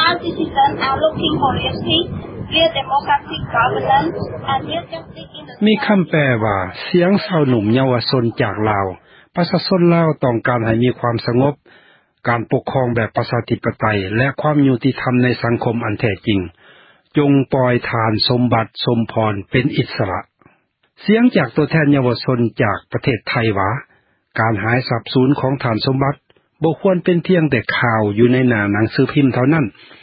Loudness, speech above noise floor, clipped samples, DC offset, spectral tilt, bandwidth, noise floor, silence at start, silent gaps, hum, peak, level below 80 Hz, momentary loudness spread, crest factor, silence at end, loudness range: -17 LUFS; 43 dB; under 0.1%; under 0.1%; -12 dB/octave; 5.2 kHz; -59 dBFS; 0 s; none; none; 0 dBFS; -44 dBFS; 7 LU; 16 dB; 0.3 s; 2 LU